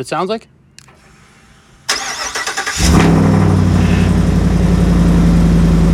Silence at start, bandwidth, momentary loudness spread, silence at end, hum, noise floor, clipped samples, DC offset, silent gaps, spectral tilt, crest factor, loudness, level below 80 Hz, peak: 0 s; 13.5 kHz; 8 LU; 0 s; none; -45 dBFS; under 0.1%; under 0.1%; none; -6 dB/octave; 12 dB; -13 LUFS; -20 dBFS; 0 dBFS